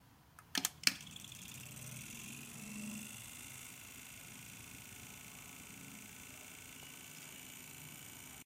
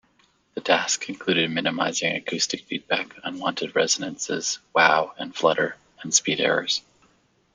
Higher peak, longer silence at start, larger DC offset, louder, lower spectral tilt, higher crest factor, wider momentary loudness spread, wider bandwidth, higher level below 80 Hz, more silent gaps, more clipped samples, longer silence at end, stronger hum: second, -10 dBFS vs -2 dBFS; second, 0 s vs 0.55 s; neither; second, -45 LUFS vs -23 LUFS; about the same, -1.5 dB/octave vs -2 dB/octave; first, 38 dB vs 22 dB; first, 13 LU vs 9 LU; first, 16.5 kHz vs 10 kHz; about the same, -74 dBFS vs -70 dBFS; neither; neither; second, 0 s vs 0.75 s; neither